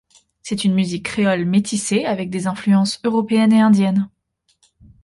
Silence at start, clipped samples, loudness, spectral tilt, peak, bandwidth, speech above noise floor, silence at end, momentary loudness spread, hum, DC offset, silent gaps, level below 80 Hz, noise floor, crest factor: 0.45 s; under 0.1%; -18 LUFS; -5.5 dB/octave; -4 dBFS; 11.5 kHz; 48 dB; 0.95 s; 9 LU; none; under 0.1%; none; -56 dBFS; -65 dBFS; 14 dB